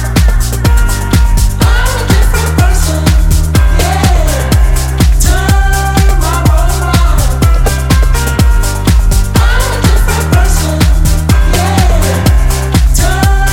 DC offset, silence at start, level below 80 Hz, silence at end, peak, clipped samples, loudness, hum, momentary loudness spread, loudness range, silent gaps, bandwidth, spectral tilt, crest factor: under 0.1%; 0 s; -10 dBFS; 0 s; 0 dBFS; 0.2%; -10 LUFS; none; 2 LU; 0 LU; none; 17 kHz; -5 dB/octave; 8 dB